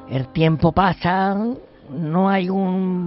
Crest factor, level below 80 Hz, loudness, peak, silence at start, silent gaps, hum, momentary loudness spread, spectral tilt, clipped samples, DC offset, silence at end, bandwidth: 16 dB; -42 dBFS; -19 LUFS; -2 dBFS; 0 s; none; none; 11 LU; -6 dB/octave; under 0.1%; under 0.1%; 0 s; 5.8 kHz